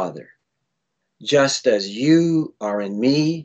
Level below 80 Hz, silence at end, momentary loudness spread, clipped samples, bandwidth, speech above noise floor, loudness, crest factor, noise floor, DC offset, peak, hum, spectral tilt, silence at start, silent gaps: -68 dBFS; 0 s; 9 LU; under 0.1%; 8.6 kHz; 58 dB; -19 LUFS; 16 dB; -77 dBFS; under 0.1%; -4 dBFS; none; -5 dB/octave; 0 s; none